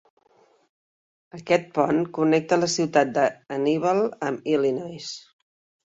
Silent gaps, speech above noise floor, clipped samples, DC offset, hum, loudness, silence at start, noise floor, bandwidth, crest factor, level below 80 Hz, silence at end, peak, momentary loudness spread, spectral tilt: none; 38 dB; under 0.1%; under 0.1%; none; -23 LUFS; 1.35 s; -61 dBFS; 8.2 kHz; 20 dB; -68 dBFS; 0.65 s; -4 dBFS; 13 LU; -5 dB/octave